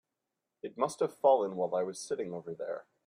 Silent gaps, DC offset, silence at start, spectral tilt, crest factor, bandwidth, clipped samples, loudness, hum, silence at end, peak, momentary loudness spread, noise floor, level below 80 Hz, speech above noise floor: none; under 0.1%; 0.65 s; -5 dB/octave; 20 dB; 14.5 kHz; under 0.1%; -32 LUFS; none; 0.25 s; -14 dBFS; 13 LU; -87 dBFS; -82 dBFS; 55 dB